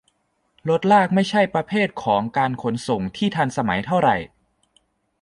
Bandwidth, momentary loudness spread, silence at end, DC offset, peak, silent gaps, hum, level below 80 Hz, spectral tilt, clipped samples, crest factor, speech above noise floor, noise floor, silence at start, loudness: 11.5 kHz; 9 LU; 0.95 s; under 0.1%; -4 dBFS; none; none; -54 dBFS; -6 dB/octave; under 0.1%; 18 dB; 47 dB; -67 dBFS; 0.65 s; -21 LUFS